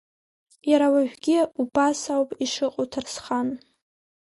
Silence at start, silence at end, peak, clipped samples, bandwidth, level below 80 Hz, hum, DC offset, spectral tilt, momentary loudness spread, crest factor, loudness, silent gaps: 0.65 s; 0.65 s; -8 dBFS; under 0.1%; 11.5 kHz; -64 dBFS; none; under 0.1%; -3.5 dB/octave; 10 LU; 16 dB; -24 LUFS; none